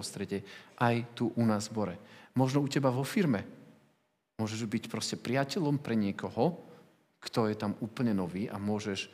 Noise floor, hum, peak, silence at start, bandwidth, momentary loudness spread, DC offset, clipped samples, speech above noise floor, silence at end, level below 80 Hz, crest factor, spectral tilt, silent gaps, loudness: -75 dBFS; none; -14 dBFS; 0 s; 15.5 kHz; 9 LU; under 0.1%; under 0.1%; 43 dB; 0.05 s; -78 dBFS; 18 dB; -6 dB/octave; none; -32 LUFS